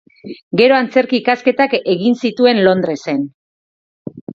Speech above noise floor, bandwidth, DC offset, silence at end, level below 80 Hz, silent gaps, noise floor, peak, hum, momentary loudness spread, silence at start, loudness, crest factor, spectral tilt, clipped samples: over 76 dB; 7.4 kHz; under 0.1%; 0 s; -62 dBFS; 0.43-0.51 s, 3.34-4.05 s, 4.21-4.27 s; under -90 dBFS; 0 dBFS; none; 21 LU; 0.25 s; -14 LUFS; 16 dB; -6 dB/octave; under 0.1%